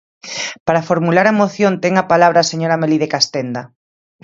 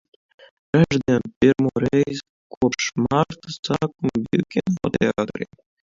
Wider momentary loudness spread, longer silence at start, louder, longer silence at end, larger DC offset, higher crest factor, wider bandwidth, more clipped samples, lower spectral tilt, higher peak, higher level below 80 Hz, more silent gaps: first, 12 LU vs 8 LU; second, 0.25 s vs 0.75 s; first, -15 LUFS vs -21 LUFS; first, 0.6 s vs 0.4 s; neither; about the same, 16 dB vs 18 dB; about the same, 7.8 kHz vs 7.6 kHz; neither; second, -4.5 dB/octave vs -6 dB/octave; first, 0 dBFS vs -4 dBFS; second, -58 dBFS vs -50 dBFS; second, 0.60-0.66 s vs 1.36-1.41 s, 2.29-2.50 s, 2.57-2.61 s, 3.59-3.63 s